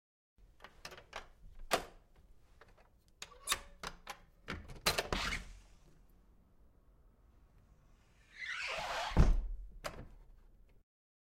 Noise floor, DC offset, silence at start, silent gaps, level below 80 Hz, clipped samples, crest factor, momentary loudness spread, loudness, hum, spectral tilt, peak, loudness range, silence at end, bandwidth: -66 dBFS; under 0.1%; 0.4 s; none; -44 dBFS; under 0.1%; 28 dB; 24 LU; -39 LUFS; none; -3.5 dB/octave; -12 dBFS; 6 LU; 0.95 s; 16.5 kHz